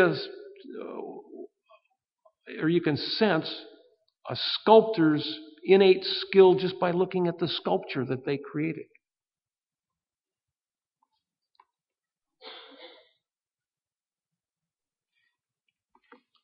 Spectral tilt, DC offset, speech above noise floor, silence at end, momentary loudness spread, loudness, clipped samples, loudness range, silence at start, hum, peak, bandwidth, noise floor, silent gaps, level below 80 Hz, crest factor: -4 dB/octave; under 0.1%; over 66 dB; 3.55 s; 25 LU; -25 LUFS; under 0.1%; 13 LU; 0 s; none; -4 dBFS; 5.8 kHz; under -90 dBFS; none; -76 dBFS; 24 dB